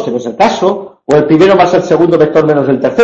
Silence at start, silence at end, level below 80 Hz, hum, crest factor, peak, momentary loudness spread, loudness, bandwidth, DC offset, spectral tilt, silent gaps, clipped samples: 0 s; 0 s; -46 dBFS; none; 8 dB; 0 dBFS; 7 LU; -9 LUFS; 8.2 kHz; under 0.1%; -6.5 dB/octave; none; 0.2%